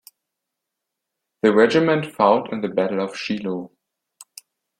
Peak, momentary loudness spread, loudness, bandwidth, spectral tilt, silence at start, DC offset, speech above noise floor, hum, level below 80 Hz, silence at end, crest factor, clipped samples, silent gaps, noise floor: -2 dBFS; 10 LU; -20 LUFS; 15.5 kHz; -6 dB/octave; 1.45 s; under 0.1%; 63 dB; none; -66 dBFS; 1.15 s; 20 dB; under 0.1%; none; -82 dBFS